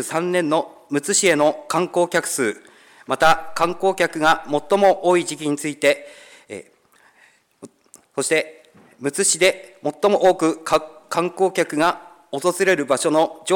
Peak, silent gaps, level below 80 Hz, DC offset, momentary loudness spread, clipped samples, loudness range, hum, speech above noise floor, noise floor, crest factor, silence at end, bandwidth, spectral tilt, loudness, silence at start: -6 dBFS; none; -56 dBFS; under 0.1%; 12 LU; under 0.1%; 6 LU; none; 37 dB; -56 dBFS; 16 dB; 0 s; 19 kHz; -3 dB/octave; -19 LUFS; 0 s